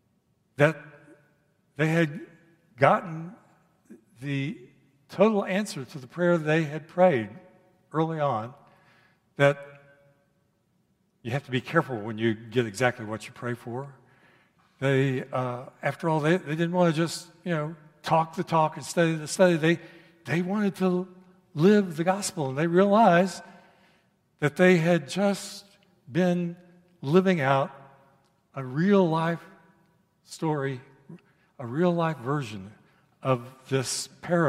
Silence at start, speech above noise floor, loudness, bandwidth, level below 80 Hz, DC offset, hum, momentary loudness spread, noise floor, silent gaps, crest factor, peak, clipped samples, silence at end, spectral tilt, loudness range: 0.6 s; 45 dB; -26 LUFS; 14.5 kHz; -72 dBFS; under 0.1%; none; 17 LU; -70 dBFS; none; 24 dB; -4 dBFS; under 0.1%; 0 s; -6 dB/octave; 7 LU